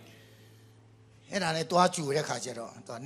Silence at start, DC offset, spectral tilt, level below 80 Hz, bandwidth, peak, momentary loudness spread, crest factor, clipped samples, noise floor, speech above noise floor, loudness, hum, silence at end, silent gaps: 0 s; under 0.1%; -4 dB/octave; -72 dBFS; 14.5 kHz; -10 dBFS; 15 LU; 24 dB; under 0.1%; -57 dBFS; 27 dB; -29 LUFS; none; 0 s; none